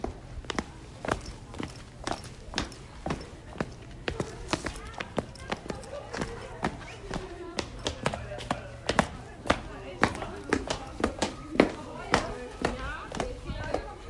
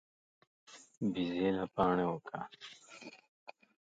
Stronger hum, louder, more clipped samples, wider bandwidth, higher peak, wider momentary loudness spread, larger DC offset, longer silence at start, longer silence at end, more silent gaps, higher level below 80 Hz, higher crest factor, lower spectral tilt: neither; about the same, -33 LUFS vs -35 LUFS; neither; first, 11.5 kHz vs 9 kHz; first, -4 dBFS vs -16 dBFS; second, 11 LU vs 25 LU; neither; second, 0 s vs 0.7 s; second, 0 s vs 0.4 s; second, none vs 0.97-1.01 s, 3.28-3.46 s; first, -46 dBFS vs -68 dBFS; first, 30 dB vs 22 dB; second, -4.5 dB/octave vs -6.5 dB/octave